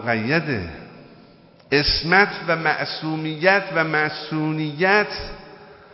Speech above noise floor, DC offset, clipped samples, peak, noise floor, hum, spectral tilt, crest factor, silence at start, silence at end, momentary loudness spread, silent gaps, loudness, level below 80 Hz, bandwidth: 29 dB; under 0.1%; under 0.1%; 0 dBFS; -49 dBFS; none; -8 dB/octave; 22 dB; 0 s; 0.2 s; 12 LU; none; -20 LUFS; -42 dBFS; 5.8 kHz